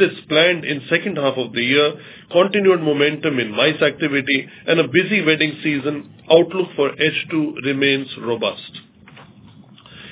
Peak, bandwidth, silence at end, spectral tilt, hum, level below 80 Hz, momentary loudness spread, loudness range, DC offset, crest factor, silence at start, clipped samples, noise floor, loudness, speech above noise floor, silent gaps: 0 dBFS; 4 kHz; 0 s; -9 dB/octave; none; -64 dBFS; 7 LU; 4 LU; under 0.1%; 18 dB; 0 s; under 0.1%; -45 dBFS; -18 LUFS; 26 dB; none